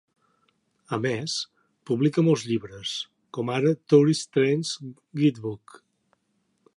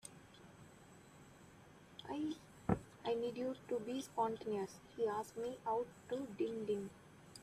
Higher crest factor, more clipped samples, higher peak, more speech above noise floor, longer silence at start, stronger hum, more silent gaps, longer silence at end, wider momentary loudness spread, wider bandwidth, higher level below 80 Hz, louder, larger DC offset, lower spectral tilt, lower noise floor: about the same, 20 dB vs 22 dB; neither; first, -6 dBFS vs -20 dBFS; first, 48 dB vs 20 dB; first, 0.9 s vs 0.05 s; neither; neither; first, 1.2 s vs 0 s; second, 16 LU vs 21 LU; second, 11.5 kHz vs 14.5 kHz; about the same, -68 dBFS vs -68 dBFS; first, -25 LUFS vs -43 LUFS; neither; about the same, -6 dB/octave vs -6 dB/octave; first, -72 dBFS vs -62 dBFS